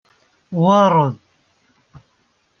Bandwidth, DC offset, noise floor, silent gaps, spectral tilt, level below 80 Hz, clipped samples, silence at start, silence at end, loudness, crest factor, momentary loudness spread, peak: 6.6 kHz; under 0.1%; -63 dBFS; none; -7.5 dB/octave; -62 dBFS; under 0.1%; 0.5 s; 1.45 s; -16 LUFS; 18 dB; 16 LU; -2 dBFS